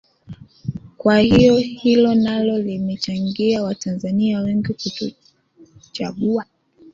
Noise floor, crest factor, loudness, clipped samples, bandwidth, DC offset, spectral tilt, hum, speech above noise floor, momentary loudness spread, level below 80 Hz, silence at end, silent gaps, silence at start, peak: -50 dBFS; 16 dB; -18 LUFS; under 0.1%; 7.6 kHz; under 0.1%; -6.5 dB/octave; none; 32 dB; 16 LU; -46 dBFS; 0.05 s; none; 0.3 s; -2 dBFS